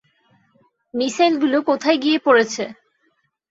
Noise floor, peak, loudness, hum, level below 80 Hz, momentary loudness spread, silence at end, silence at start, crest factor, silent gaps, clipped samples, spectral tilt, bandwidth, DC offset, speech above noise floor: -67 dBFS; -2 dBFS; -18 LUFS; none; -68 dBFS; 13 LU; 0.75 s; 0.95 s; 18 dB; none; under 0.1%; -3 dB/octave; 8 kHz; under 0.1%; 49 dB